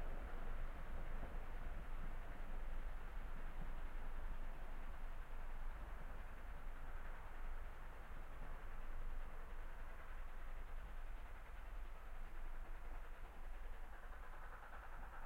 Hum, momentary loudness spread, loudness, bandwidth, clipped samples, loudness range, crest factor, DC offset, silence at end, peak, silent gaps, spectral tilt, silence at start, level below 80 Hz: none; 4 LU; -56 LUFS; 4.2 kHz; under 0.1%; 3 LU; 12 dB; under 0.1%; 0 s; -34 dBFS; none; -6 dB/octave; 0 s; -48 dBFS